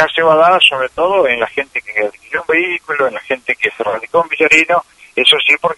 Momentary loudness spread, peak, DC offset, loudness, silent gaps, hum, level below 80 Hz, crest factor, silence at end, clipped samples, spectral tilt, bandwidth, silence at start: 11 LU; 0 dBFS; under 0.1%; -13 LUFS; none; none; -54 dBFS; 14 dB; 0.05 s; under 0.1%; -2.5 dB/octave; 11.5 kHz; 0 s